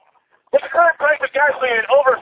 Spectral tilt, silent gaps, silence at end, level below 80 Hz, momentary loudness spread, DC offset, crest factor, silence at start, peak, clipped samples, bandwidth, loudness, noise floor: -5.5 dB/octave; none; 0 s; -62 dBFS; 5 LU; under 0.1%; 16 dB; 0.55 s; 0 dBFS; under 0.1%; 4 kHz; -16 LUFS; -58 dBFS